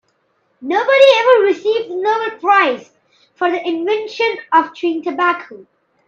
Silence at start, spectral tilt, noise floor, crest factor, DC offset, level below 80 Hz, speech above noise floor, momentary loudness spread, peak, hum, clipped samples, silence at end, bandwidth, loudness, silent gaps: 0.6 s; -3 dB/octave; -63 dBFS; 16 dB; under 0.1%; -72 dBFS; 48 dB; 11 LU; 0 dBFS; none; under 0.1%; 0.45 s; 7.6 kHz; -15 LUFS; none